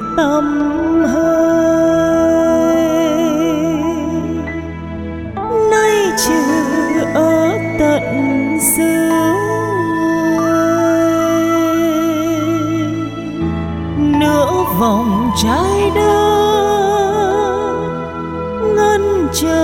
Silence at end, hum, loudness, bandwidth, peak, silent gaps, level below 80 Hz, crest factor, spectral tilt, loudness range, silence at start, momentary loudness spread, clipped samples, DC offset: 0 s; none; -14 LUFS; 17 kHz; 0 dBFS; none; -36 dBFS; 14 dB; -5 dB/octave; 3 LU; 0 s; 8 LU; under 0.1%; under 0.1%